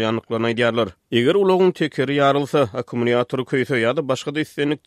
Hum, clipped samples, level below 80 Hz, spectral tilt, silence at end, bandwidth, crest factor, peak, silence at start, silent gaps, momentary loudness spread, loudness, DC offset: none; under 0.1%; -62 dBFS; -6 dB/octave; 0.1 s; 13 kHz; 16 dB; -4 dBFS; 0 s; none; 6 LU; -20 LUFS; under 0.1%